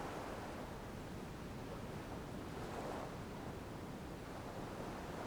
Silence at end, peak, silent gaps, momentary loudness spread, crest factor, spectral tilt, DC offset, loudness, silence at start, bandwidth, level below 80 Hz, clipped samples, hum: 0 s; -34 dBFS; none; 3 LU; 14 dB; -5.5 dB/octave; under 0.1%; -48 LUFS; 0 s; over 20 kHz; -58 dBFS; under 0.1%; none